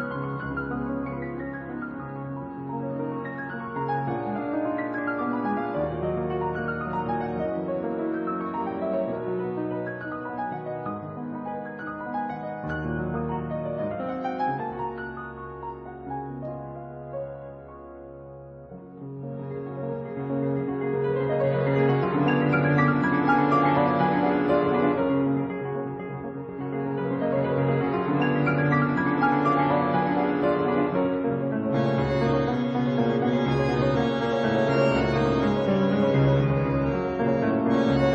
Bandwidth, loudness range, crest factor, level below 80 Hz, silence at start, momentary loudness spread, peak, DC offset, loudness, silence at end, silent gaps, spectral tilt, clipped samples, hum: 7.8 kHz; 11 LU; 18 dB; -48 dBFS; 0 s; 13 LU; -8 dBFS; under 0.1%; -26 LUFS; 0 s; none; -8.5 dB/octave; under 0.1%; none